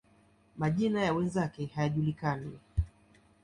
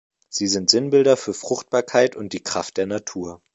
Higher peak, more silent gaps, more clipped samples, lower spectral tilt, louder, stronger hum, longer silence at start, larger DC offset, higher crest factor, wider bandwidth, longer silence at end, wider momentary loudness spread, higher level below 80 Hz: second, -16 dBFS vs 0 dBFS; neither; neither; first, -7.5 dB/octave vs -3 dB/octave; second, -32 LUFS vs -20 LUFS; neither; first, 0.55 s vs 0.3 s; neither; second, 16 dB vs 22 dB; first, 10.5 kHz vs 8.2 kHz; first, 0.55 s vs 0.2 s; second, 8 LU vs 13 LU; first, -46 dBFS vs -60 dBFS